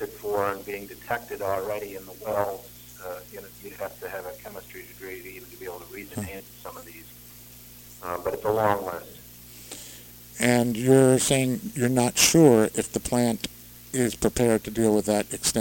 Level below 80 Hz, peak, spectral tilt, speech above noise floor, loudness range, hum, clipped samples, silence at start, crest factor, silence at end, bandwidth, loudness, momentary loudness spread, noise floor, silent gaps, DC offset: -52 dBFS; -2 dBFS; -4.5 dB/octave; 22 dB; 17 LU; 60 Hz at -55 dBFS; under 0.1%; 0 s; 24 dB; 0 s; 17 kHz; -24 LUFS; 24 LU; -47 dBFS; none; under 0.1%